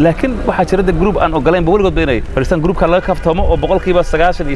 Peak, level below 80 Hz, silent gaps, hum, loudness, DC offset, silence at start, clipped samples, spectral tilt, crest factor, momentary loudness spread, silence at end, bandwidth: 0 dBFS; -20 dBFS; none; none; -13 LUFS; under 0.1%; 0 s; under 0.1%; -7 dB/octave; 12 dB; 4 LU; 0 s; 11.5 kHz